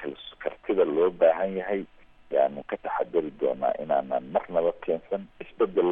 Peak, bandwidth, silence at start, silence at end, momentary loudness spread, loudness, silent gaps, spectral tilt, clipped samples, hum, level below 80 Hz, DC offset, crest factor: -10 dBFS; 3.8 kHz; 0 s; 0 s; 12 LU; -27 LUFS; none; -9 dB/octave; under 0.1%; none; -60 dBFS; under 0.1%; 18 dB